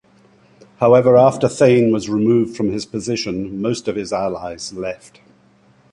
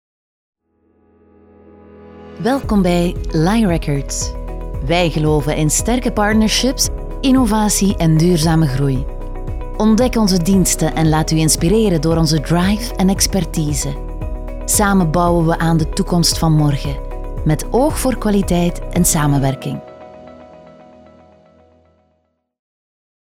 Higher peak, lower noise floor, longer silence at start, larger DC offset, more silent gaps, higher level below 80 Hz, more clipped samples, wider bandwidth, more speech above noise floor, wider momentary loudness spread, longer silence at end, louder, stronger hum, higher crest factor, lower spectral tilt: about the same, -2 dBFS vs 0 dBFS; second, -53 dBFS vs -65 dBFS; second, 0.8 s vs 1.95 s; neither; neither; second, -52 dBFS vs -26 dBFS; neither; second, 11 kHz vs 17 kHz; second, 37 dB vs 50 dB; about the same, 14 LU vs 12 LU; second, 1 s vs 2.45 s; about the same, -17 LUFS vs -15 LUFS; neither; about the same, 16 dB vs 16 dB; about the same, -6 dB/octave vs -5 dB/octave